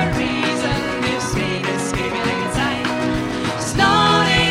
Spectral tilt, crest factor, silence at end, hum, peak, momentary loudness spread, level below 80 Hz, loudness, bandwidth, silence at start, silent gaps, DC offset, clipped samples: -4 dB/octave; 16 dB; 0 s; none; -2 dBFS; 7 LU; -36 dBFS; -18 LUFS; 16 kHz; 0 s; none; under 0.1%; under 0.1%